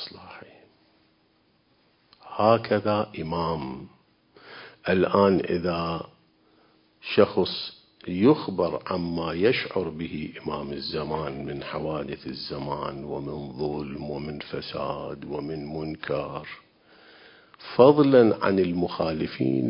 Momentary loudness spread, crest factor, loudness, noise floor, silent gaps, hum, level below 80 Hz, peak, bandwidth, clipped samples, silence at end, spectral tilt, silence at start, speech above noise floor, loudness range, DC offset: 17 LU; 24 dB; -26 LUFS; -65 dBFS; none; none; -52 dBFS; -2 dBFS; 5.4 kHz; under 0.1%; 0 s; -10.5 dB/octave; 0 s; 40 dB; 10 LU; under 0.1%